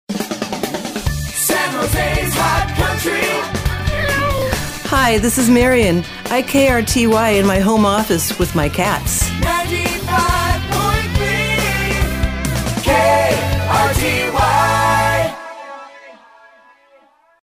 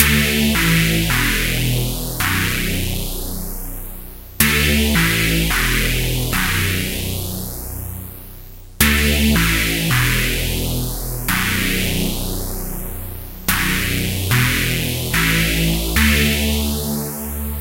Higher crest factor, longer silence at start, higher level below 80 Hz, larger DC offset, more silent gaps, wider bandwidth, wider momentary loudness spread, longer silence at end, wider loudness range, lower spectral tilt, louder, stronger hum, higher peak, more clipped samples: about the same, 16 dB vs 18 dB; about the same, 0.1 s vs 0 s; about the same, -28 dBFS vs -26 dBFS; second, under 0.1% vs 0.1%; neither; about the same, 16 kHz vs 17 kHz; second, 8 LU vs 13 LU; first, 1.4 s vs 0 s; about the same, 3 LU vs 4 LU; about the same, -4.5 dB/octave vs -3.5 dB/octave; about the same, -16 LUFS vs -17 LUFS; neither; about the same, 0 dBFS vs 0 dBFS; neither